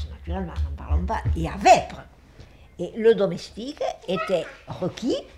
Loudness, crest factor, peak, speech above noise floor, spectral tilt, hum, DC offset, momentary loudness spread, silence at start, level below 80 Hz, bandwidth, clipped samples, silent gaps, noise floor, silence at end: -24 LUFS; 20 dB; -4 dBFS; 24 dB; -5.5 dB/octave; none; under 0.1%; 17 LU; 0 s; -34 dBFS; 12.5 kHz; under 0.1%; none; -48 dBFS; 0 s